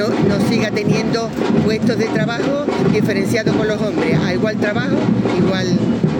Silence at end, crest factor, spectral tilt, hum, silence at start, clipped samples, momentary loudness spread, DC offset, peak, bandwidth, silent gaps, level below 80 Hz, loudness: 0 s; 14 dB; -6.5 dB/octave; none; 0 s; under 0.1%; 2 LU; under 0.1%; -2 dBFS; 17 kHz; none; -46 dBFS; -17 LUFS